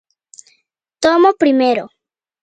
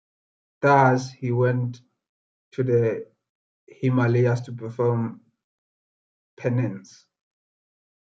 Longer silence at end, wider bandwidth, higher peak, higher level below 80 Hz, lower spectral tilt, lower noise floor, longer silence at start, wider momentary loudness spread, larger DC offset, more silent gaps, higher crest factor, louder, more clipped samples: second, 0.55 s vs 1.25 s; first, 9.4 kHz vs 7.4 kHz; first, 0 dBFS vs -4 dBFS; first, -58 dBFS vs -70 dBFS; second, -3.5 dB/octave vs -8 dB/octave; second, -63 dBFS vs under -90 dBFS; first, 1 s vs 0.6 s; second, 6 LU vs 14 LU; neither; second, none vs 2.09-2.52 s, 3.30-3.67 s, 5.44-6.37 s; second, 16 dB vs 22 dB; first, -14 LUFS vs -23 LUFS; neither